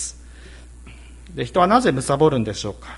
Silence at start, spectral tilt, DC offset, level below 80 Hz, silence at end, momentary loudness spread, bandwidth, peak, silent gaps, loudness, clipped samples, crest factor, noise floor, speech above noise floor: 0 s; -5 dB/octave; under 0.1%; -42 dBFS; 0 s; 14 LU; 11.5 kHz; -2 dBFS; none; -19 LUFS; under 0.1%; 20 dB; -41 dBFS; 22 dB